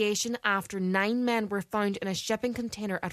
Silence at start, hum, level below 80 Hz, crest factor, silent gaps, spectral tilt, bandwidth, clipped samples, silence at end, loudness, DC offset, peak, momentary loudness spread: 0 s; none; -64 dBFS; 18 dB; none; -4 dB/octave; 14 kHz; under 0.1%; 0 s; -29 LUFS; under 0.1%; -10 dBFS; 6 LU